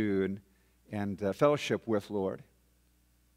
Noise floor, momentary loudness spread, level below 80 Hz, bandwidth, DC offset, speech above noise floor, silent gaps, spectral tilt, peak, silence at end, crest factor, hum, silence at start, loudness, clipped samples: -68 dBFS; 14 LU; -68 dBFS; 16 kHz; under 0.1%; 37 dB; none; -6.5 dB/octave; -12 dBFS; 0.95 s; 20 dB; 60 Hz at -65 dBFS; 0 s; -32 LUFS; under 0.1%